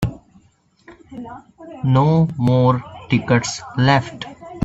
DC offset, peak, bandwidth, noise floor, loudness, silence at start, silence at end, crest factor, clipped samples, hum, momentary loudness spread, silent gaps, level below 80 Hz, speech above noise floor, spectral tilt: under 0.1%; -2 dBFS; 8 kHz; -56 dBFS; -18 LUFS; 0 s; 0 s; 16 dB; under 0.1%; none; 21 LU; none; -46 dBFS; 38 dB; -6.5 dB/octave